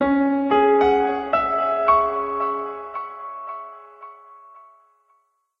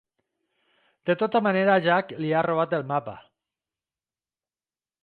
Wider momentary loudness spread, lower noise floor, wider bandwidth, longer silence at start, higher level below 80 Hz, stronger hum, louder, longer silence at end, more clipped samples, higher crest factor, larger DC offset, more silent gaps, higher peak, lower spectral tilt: first, 23 LU vs 9 LU; second, -65 dBFS vs under -90 dBFS; first, 5.8 kHz vs 4.8 kHz; second, 0 s vs 1.05 s; first, -52 dBFS vs -72 dBFS; neither; first, -20 LUFS vs -24 LUFS; second, 1 s vs 1.85 s; neither; about the same, 18 dB vs 20 dB; neither; neither; first, -4 dBFS vs -8 dBFS; second, -7 dB/octave vs -9 dB/octave